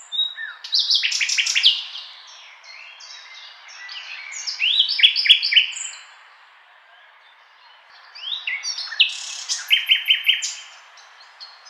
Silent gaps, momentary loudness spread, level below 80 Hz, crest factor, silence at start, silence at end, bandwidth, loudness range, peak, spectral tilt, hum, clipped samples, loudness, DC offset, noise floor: none; 25 LU; under -90 dBFS; 22 dB; 0 s; 0 s; 16.5 kHz; 8 LU; 0 dBFS; 9 dB/octave; none; under 0.1%; -17 LUFS; under 0.1%; -51 dBFS